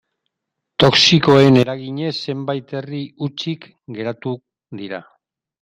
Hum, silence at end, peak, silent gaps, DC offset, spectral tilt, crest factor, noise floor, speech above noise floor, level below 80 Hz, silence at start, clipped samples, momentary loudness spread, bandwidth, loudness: none; 0.6 s; 0 dBFS; none; under 0.1%; -5 dB/octave; 18 dB; -80 dBFS; 62 dB; -52 dBFS; 0.8 s; under 0.1%; 20 LU; 10.5 kHz; -16 LUFS